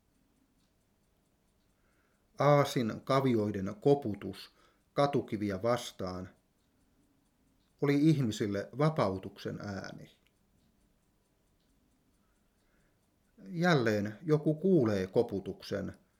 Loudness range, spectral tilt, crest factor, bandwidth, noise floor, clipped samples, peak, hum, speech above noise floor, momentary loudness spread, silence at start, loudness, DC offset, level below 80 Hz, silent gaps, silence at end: 6 LU; -7 dB/octave; 22 dB; 16 kHz; -73 dBFS; under 0.1%; -12 dBFS; none; 42 dB; 14 LU; 2.4 s; -31 LUFS; under 0.1%; -72 dBFS; none; 0.25 s